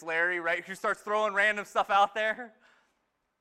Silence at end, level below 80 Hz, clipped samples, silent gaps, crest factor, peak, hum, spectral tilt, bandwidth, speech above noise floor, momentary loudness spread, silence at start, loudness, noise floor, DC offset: 0.95 s; -70 dBFS; under 0.1%; none; 18 dB; -12 dBFS; none; -3 dB/octave; 15 kHz; 48 dB; 7 LU; 0 s; -28 LUFS; -77 dBFS; under 0.1%